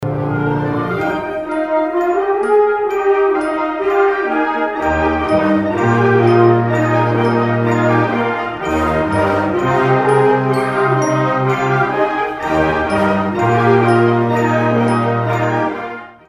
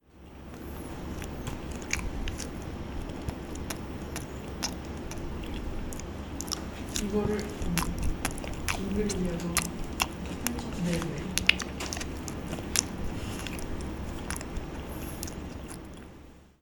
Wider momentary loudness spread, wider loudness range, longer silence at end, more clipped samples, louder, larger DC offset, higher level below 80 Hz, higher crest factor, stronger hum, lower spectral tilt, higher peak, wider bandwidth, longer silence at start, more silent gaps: second, 6 LU vs 11 LU; second, 2 LU vs 7 LU; about the same, 0.15 s vs 0.15 s; neither; first, -15 LUFS vs -33 LUFS; neither; about the same, -40 dBFS vs -40 dBFS; second, 14 dB vs 34 dB; neither; first, -7.5 dB/octave vs -3.5 dB/octave; about the same, 0 dBFS vs 0 dBFS; second, 11.5 kHz vs 18.5 kHz; about the same, 0 s vs 0.1 s; neither